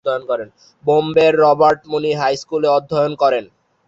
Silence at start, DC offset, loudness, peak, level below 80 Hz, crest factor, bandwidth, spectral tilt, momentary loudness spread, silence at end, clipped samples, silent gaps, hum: 0.05 s; under 0.1%; -16 LUFS; -2 dBFS; -58 dBFS; 14 dB; 7.8 kHz; -5.5 dB/octave; 11 LU; 0.45 s; under 0.1%; none; none